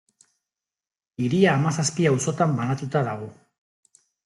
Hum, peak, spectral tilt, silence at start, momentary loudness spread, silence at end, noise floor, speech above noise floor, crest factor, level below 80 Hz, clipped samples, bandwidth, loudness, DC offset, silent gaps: none; -6 dBFS; -5.5 dB/octave; 1.2 s; 13 LU; 0.9 s; under -90 dBFS; over 68 dB; 18 dB; -64 dBFS; under 0.1%; 12 kHz; -23 LUFS; under 0.1%; none